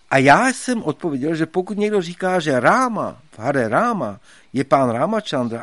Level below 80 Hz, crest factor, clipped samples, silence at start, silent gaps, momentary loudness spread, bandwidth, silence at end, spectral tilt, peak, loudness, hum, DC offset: -58 dBFS; 18 dB; under 0.1%; 0.1 s; none; 12 LU; 11.5 kHz; 0 s; -5.5 dB/octave; 0 dBFS; -19 LUFS; none; 0.2%